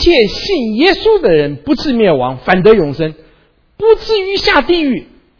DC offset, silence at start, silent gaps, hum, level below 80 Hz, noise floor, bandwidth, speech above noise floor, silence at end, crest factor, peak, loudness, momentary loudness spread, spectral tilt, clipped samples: under 0.1%; 0 s; none; none; -32 dBFS; -50 dBFS; 5.4 kHz; 39 dB; 0.35 s; 12 dB; 0 dBFS; -12 LUFS; 7 LU; -6 dB/octave; 0.3%